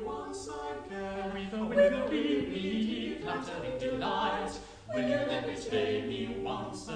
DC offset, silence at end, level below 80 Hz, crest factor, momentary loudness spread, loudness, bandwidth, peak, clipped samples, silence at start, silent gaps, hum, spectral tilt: under 0.1%; 0 s; -56 dBFS; 18 dB; 12 LU; -33 LUFS; 10 kHz; -14 dBFS; under 0.1%; 0 s; none; none; -5 dB/octave